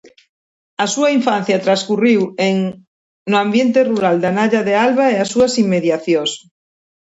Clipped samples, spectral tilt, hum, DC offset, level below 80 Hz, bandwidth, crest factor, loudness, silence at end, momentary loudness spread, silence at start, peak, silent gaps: under 0.1%; -5 dB/octave; none; under 0.1%; -58 dBFS; 8 kHz; 14 dB; -15 LUFS; 0.75 s; 7 LU; 0.8 s; -2 dBFS; 2.87-3.26 s